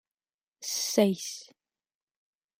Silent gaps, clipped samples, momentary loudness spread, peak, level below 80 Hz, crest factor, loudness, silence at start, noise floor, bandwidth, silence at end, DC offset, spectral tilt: none; under 0.1%; 15 LU; -10 dBFS; -80 dBFS; 22 dB; -28 LUFS; 0.6 s; under -90 dBFS; 16 kHz; 1.15 s; under 0.1%; -3.5 dB/octave